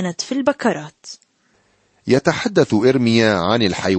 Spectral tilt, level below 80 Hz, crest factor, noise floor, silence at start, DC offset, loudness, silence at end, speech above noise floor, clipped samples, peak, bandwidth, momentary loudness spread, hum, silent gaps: -5.5 dB/octave; -54 dBFS; 16 dB; -61 dBFS; 0 s; under 0.1%; -17 LUFS; 0 s; 44 dB; under 0.1%; -2 dBFS; 8.8 kHz; 18 LU; none; none